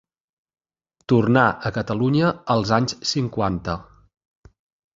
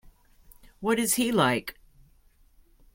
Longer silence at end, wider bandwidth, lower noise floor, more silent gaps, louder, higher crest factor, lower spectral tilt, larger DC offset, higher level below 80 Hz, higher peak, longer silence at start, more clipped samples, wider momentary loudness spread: about the same, 1.15 s vs 1.2 s; second, 7.8 kHz vs 16.5 kHz; first, -71 dBFS vs -60 dBFS; neither; first, -21 LUFS vs -25 LUFS; about the same, 20 dB vs 20 dB; first, -6 dB/octave vs -3.5 dB/octave; neither; first, -48 dBFS vs -56 dBFS; first, -2 dBFS vs -10 dBFS; first, 1.1 s vs 0.8 s; neither; about the same, 10 LU vs 10 LU